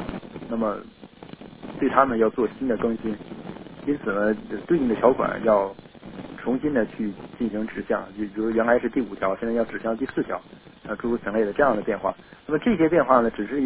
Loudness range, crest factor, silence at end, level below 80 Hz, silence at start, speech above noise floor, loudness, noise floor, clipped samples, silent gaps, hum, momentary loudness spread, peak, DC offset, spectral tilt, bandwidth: 2 LU; 24 dB; 0 s; -52 dBFS; 0 s; 19 dB; -24 LUFS; -43 dBFS; under 0.1%; none; none; 18 LU; -2 dBFS; under 0.1%; -10.5 dB/octave; 4 kHz